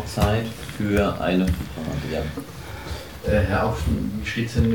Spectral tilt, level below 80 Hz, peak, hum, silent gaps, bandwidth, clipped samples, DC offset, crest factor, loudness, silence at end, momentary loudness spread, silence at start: -6.5 dB/octave; -34 dBFS; -6 dBFS; none; none; 19.5 kHz; under 0.1%; 0.4%; 16 dB; -24 LUFS; 0 s; 12 LU; 0 s